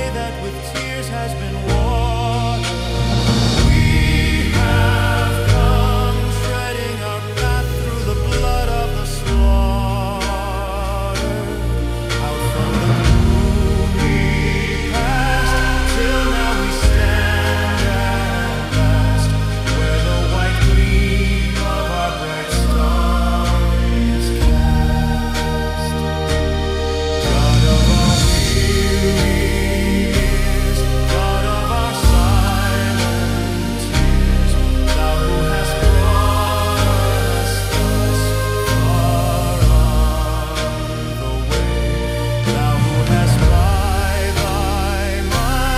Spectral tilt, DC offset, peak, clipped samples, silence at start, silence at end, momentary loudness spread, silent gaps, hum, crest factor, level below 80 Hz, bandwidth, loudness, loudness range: -5.5 dB/octave; under 0.1%; 0 dBFS; under 0.1%; 0 s; 0 s; 7 LU; none; none; 16 dB; -18 dBFS; 15.5 kHz; -17 LUFS; 4 LU